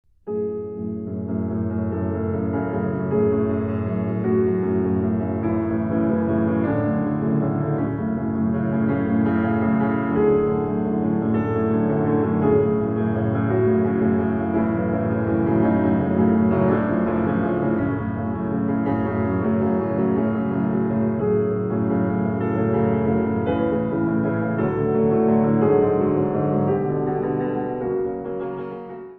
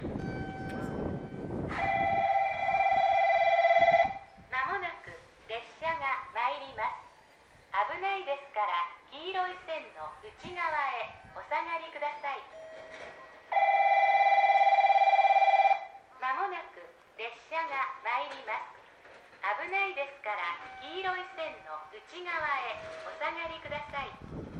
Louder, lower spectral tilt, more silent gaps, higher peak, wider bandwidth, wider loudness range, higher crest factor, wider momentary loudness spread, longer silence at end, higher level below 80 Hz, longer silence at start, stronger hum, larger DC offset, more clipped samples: first, -22 LUFS vs -30 LUFS; first, -12.5 dB/octave vs -5 dB/octave; neither; first, -6 dBFS vs -14 dBFS; second, 3.6 kHz vs 8 kHz; second, 2 LU vs 11 LU; about the same, 14 dB vs 18 dB; second, 6 LU vs 20 LU; about the same, 0 s vs 0 s; first, -48 dBFS vs -60 dBFS; first, 0.25 s vs 0 s; neither; neither; neither